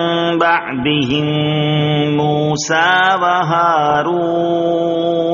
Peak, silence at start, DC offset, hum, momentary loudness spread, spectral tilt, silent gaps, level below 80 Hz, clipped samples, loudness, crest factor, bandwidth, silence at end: 0 dBFS; 0 s; under 0.1%; none; 4 LU; -3.5 dB/octave; none; -50 dBFS; under 0.1%; -14 LUFS; 14 dB; 7.2 kHz; 0 s